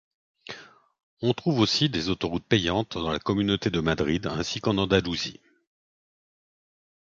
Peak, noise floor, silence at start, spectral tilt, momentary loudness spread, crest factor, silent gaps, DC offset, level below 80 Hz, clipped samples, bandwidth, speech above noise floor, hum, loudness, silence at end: -6 dBFS; -45 dBFS; 0.5 s; -5.5 dB/octave; 9 LU; 22 dB; 1.03-1.17 s; under 0.1%; -48 dBFS; under 0.1%; 7.6 kHz; 19 dB; none; -26 LUFS; 1.7 s